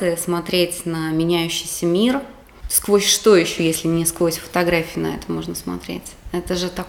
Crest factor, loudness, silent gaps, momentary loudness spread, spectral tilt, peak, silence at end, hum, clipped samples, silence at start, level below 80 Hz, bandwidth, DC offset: 18 dB; -19 LUFS; none; 14 LU; -4 dB/octave; -2 dBFS; 0 s; none; under 0.1%; 0 s; -42 dBFS; 19.5 kHz; under 0.1%